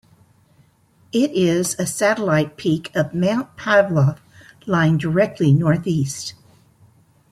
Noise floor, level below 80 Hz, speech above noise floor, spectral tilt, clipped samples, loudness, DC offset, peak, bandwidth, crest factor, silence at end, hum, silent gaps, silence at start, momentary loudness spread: -56 dBFS; -54 dBFS; 38 dB; -6 dB/octave; under 0.1%; -19 LUFS; under 0.1%; -2 dBFS; 15.5 kHz; 18 dB; 1 s; none; none; 1.15 s; 8 LU